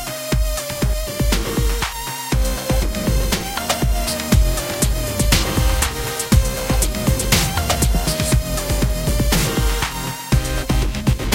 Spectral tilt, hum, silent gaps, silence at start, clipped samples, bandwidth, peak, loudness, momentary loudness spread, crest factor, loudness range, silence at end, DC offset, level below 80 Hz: -4 dB/octave; none; none; 0 s; under 0.1%; 17 kHz; 0 dBFS; -19 LUFS; 5 LU; 18 dB; 3 LU; 0 s; 0.1%; -22 dBFS